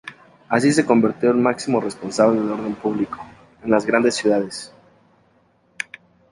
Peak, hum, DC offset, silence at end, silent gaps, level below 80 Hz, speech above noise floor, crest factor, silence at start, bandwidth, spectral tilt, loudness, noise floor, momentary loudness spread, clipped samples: -2 dBFS; none; under 0.1%; 0.5 s; none; -58 dBFS; 41 dB; 18 dB; 0.05 s; 11.5 kHz; -5 dB/octave; -19 LUFS; -59 dBFS; 15 LU; under 0.1%